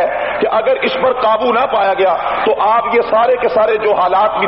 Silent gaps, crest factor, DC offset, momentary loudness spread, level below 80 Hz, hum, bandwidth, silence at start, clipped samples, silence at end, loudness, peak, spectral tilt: none; 10 dB; under 0.1%; 3 LU; -48 dBFS; none; 5.8 kHz; 0 s; under 0.1%; 0 s; -13 LUFS; -2 dBFS; -1.5 dB/octave